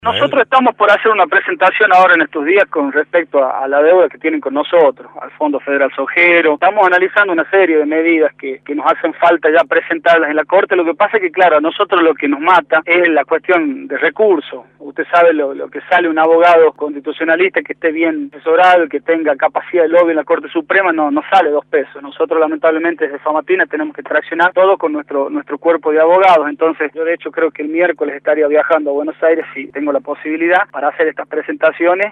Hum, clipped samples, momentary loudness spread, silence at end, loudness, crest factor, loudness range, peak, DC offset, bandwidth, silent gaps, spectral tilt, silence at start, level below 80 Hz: none; under 0.1%; 9 LU; 0 s; -13 LUFS; 12 dB; 3 LU; 0 dBFS; under 0.1%; 7.2 kHz; none; -5.5 dB/octave; 0.05 s; -66 dBFS